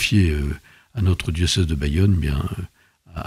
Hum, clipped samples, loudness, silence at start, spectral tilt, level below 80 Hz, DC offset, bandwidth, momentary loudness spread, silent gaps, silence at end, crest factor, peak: none; under 0.1%; -21 LUFS; 0 s; -5.5 dB/octave; -32 dBFS; under 0.1%; 14.5 kHz; 16 LU; none; 0 s; 14 dB; -6 dBFS